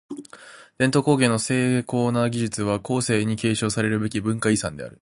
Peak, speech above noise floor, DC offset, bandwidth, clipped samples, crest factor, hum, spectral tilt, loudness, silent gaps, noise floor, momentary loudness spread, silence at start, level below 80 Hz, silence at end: -4 dBFS; 24 dB; under 0.1%; 11.5 kHz; under 0.1%; 18 dB; none; -5 dB/octave; -22 LUFS; none; -46 dBFS; 6 LU; 0.1 s; -54 dBFS; 0.15 s